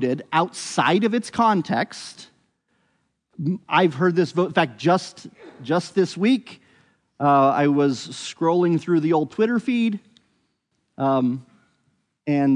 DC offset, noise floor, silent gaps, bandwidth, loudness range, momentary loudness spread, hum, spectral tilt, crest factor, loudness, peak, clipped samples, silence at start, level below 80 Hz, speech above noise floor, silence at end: under 0.1%; -72 dBFS; none; 11 kHz; 3 LU; 11 LU; none; -6 dB/octave; 18 dB; -21 LUFS; -4 dBFS; under 0.1%; 0 s; -72 dBFS; 52 dB; 0 s